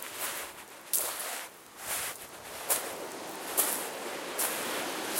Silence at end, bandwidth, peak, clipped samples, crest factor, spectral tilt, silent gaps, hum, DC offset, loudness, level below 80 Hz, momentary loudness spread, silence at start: 0 s; 17 kHz; -6 dBFS; under 0.1%; 28 dB; 0 dB/octave; none; none; under 0.1%; -33 LUFS; -72 dBFS; 13 LU; 0 s